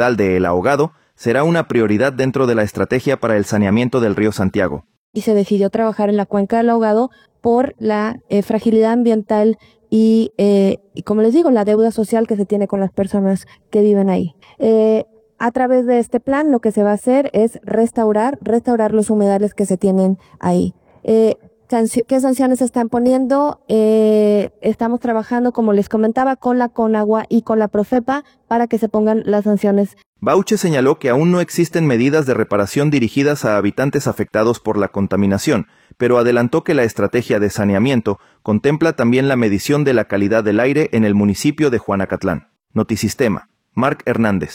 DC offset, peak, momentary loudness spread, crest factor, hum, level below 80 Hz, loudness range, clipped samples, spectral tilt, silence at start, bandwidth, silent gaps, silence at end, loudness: under 0.1%; -2 dBFS; 6 LU; 14 dB; none; -52 dBFS; 2 LU; under 0.1%; -6.5 dB/octave; 0 s; 16.5 kHz; 4.97-5.13 s, 30.06-30.13 s; 0 s; -16 LUFS